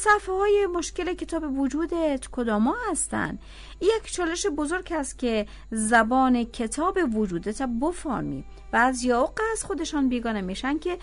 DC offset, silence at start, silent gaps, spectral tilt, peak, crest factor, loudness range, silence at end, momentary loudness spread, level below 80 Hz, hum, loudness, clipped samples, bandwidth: under 0.1%; 0 s; none; -4 dB/octave; -8 dBFS; 18 dB; 2 LU; 0 s; 8 LU; -44 dBFS; none; -25 LUFS; under 0.1%; 11 kHz